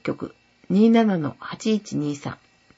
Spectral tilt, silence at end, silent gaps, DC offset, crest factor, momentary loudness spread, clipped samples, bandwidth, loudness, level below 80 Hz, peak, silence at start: -6.5 dB/octave; 0.45 s; none; under 0.1%; 16 dB; 18 LU; under 0.1%; 8 kHz; -22 LUFS; -64 dBFS; -6 dBFS; 0.05 s